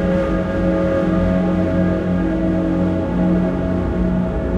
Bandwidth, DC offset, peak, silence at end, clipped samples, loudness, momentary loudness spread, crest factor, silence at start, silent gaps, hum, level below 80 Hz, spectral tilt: 7.4 kHz; under 0.1%; -6 dBFS; 0 s; under 0.1%; -18 LUFS; 2 LU; 12 dB; 0 s; none; none; -28 dBFS; -9.5 dB/octave